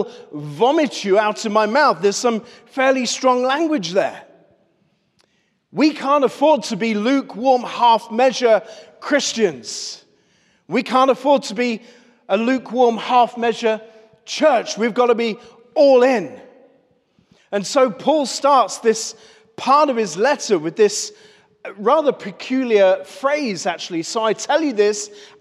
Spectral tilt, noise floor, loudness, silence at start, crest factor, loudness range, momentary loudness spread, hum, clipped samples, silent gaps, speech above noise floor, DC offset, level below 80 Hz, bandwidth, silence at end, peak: -3.5 dB/octave; -64 dBFS; -18 LUFS; 0 s; 14 dB; 3 LU; 12 LU; none; under 0.1%; none; 47 dB; under 0.1%; -78 dBFS; 13 kHz; 0.15 s; -4 dBFS